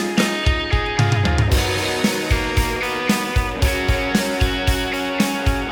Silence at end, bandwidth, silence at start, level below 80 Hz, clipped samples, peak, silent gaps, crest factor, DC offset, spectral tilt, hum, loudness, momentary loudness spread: 0 s; over 20 kHz; 0 s; -26 dBFS; under 0.1%; -2 dBFS; none; 18 dB; under 0.1%; -4.5 dB/octave; none; -19 LUFS; 3 LU